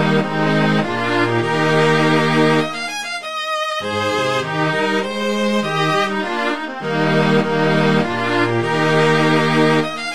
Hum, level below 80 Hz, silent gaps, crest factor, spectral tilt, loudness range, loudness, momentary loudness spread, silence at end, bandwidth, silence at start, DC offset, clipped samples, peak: none; -54 dBFS; none; 16 dB; -5.5 dB/octave; 3 LU; -17 LUFS; 7 LU; 0 s; 13.5 kHz; 0 s; 1%; under 0.1%; -2 dBFS